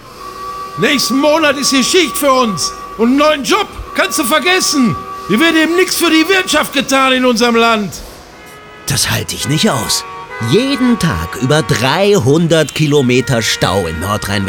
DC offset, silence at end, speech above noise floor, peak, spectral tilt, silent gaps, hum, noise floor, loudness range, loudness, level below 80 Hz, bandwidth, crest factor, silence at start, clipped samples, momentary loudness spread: under 0.1%; 0 s; 23 dB; 0 dBFS; -4 dB/octave; none; none; -35 dBFS; 4 LU; -12 LUFS; -38 dBFS; over 20 kHz; 12 dB; 0 s; under 0.1%; 8 LU